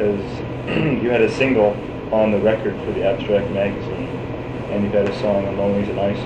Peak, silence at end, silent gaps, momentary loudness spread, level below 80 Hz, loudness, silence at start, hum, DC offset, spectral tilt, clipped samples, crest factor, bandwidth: -4 dBFS; 0 s; none; 10 LU; -42 dBFS; -20 LUFS; 0 s; none; under 0.1%; -7.5 dB/octave; under 0.1%; 16 dB; 9 kHz